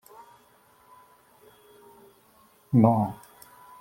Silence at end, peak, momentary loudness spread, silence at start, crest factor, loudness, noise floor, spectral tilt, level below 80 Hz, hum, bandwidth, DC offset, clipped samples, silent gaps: 0.65 s; -4 dBFS; 29 LU; 2.7 s; 24 dB; -23 LUFS; -60 dBFS; -10 dB/octave; -66 dBFS; none; 16.5 kHz; under 0.1%; under 0.1%; none